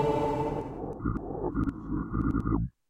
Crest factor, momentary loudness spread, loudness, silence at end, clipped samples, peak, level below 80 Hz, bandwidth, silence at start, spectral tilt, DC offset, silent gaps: 16 dB; 6 LU; -32 LUFS; 0.2 s; under 0.1%; -16 dBFS; -40 dBFS; 9.8 kHz; 0 s; -9 dB/octave; under 0.1%; none